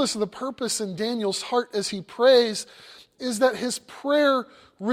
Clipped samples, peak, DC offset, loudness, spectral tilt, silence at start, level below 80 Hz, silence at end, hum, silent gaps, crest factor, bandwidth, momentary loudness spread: under 0.1%; -6 dBFS; under 0.1%; -24 LUFS; -3 dB/octave; 0 s; -68 dBFS; 0 s; none; none; 18 dB; 15.5 kHz; 14 LU